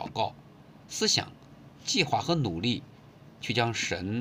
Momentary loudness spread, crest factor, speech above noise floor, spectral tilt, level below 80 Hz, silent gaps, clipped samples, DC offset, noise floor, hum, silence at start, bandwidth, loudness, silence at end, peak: 13 LU; 22 dB; 24 dB; -3.5 dB/octave; -62 dBFS; none; under 0.1%; under 0.1%; -52 dBFS; none; 0 s; 16 kHz; -29 LUFS; 0 s; -10 dBFS